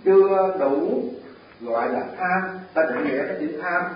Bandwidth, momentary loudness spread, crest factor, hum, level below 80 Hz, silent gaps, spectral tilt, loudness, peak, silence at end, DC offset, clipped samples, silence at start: 5.2 kHz; 9 LU; 16 dB; none; -66 dBFS; none; -11 dB/octave; -23 LUFS; -6 dBFS; 0 s; under 0.1%; under 0.1%; 0.05 s